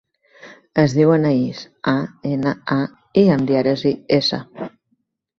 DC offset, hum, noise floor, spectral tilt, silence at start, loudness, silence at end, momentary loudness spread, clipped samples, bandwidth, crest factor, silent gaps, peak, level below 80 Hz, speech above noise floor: under 0.1%; none; -69 dBFS; -7 dB/octave; 0.45 s; -18 LUFS; 0.7 s; 11 LU; under 0.1%; 7.6 kHz; 16 dB; none; -2 dBFS; -56 dBFS; 51 dB